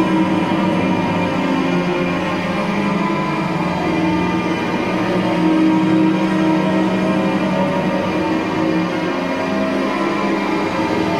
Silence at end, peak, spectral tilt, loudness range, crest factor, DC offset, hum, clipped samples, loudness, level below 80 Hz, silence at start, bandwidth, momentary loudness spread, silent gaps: 0 s; -4 dBFS; -6.5 dB/octave; 2 LU; 14 dB; under 0.1%; none; under 0.1%; -17 LUFS; -46 dBFS; 0 s; 12.5 kHz; 4 LU; none